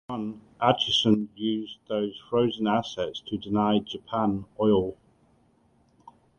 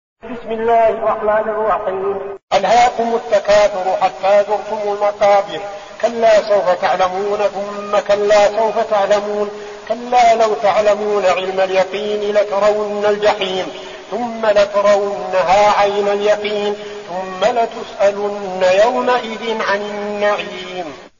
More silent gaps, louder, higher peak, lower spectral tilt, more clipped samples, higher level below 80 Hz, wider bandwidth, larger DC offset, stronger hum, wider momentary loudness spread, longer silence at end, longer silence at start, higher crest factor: second, none vs 2.43-2.47 s; second, -27 LUFS vs -15 LUFS; second, -6 dBFS vs -2 dBFS; first, -6 dB/octave vs -1.5 dB/octave; neither; second, -58 dBFS vs -50 dBFS; first, 8.8 kHz vs 7.4 kHz; second, under 0.1% vs 0.2%; neither; about the same, 11 LU vs 12 LU; first, 1.45 s vs 0.1 s; second, 0.1 s vs 0.25 s; first, 22 dB vs 14 dB